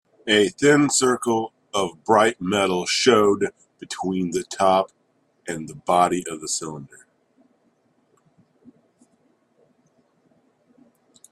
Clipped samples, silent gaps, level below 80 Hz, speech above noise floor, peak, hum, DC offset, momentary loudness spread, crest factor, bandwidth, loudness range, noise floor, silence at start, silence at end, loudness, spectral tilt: under 0.1%; none; -64 dBFS; 44 dB; -2 dBFS; none; under 0.1%; 15 LU; 22 dB; 13.5 kHz; 9 LU; -64 dBFS; 0.25 s; 4.45 s; -21 LUFS; -3.5 dB/octave